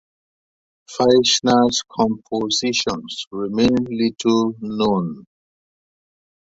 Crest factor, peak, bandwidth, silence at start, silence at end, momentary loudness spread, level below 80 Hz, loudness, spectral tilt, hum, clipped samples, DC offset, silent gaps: 18 dB; -2 dBFS; 8 kHz; 0.9 s; 1.3 s; 12 LU; -52 dBFS; -19 LUFS; -4 dB/octave; none; under 0.1%; under 0.1%; 3.27-3.31 s